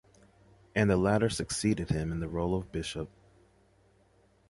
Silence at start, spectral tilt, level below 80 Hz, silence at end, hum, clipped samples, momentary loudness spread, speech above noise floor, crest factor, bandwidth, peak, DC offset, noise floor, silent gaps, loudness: 0.75 s; -5.5 dB/octave; -48 dBFS; 1.45 s; none; under 0.1%; 11 LU; 36 dB; 20 dB; 11.5 kHz; -12 dBFS; under 0.1%; -65 dBFS; none; -31 LUFS